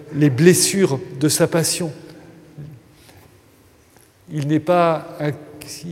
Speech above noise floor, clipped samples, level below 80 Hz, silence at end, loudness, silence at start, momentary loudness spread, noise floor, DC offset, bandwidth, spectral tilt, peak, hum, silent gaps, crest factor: 34 dB; under 0.1%; -60 dBFS; 0 s; -18 LUFS; 0 s; 26 LU; -52 dBFS; under 0.1%; 16.5 kHz; -4.5 dB/octave; 0 dBFS; none; none; 20 dB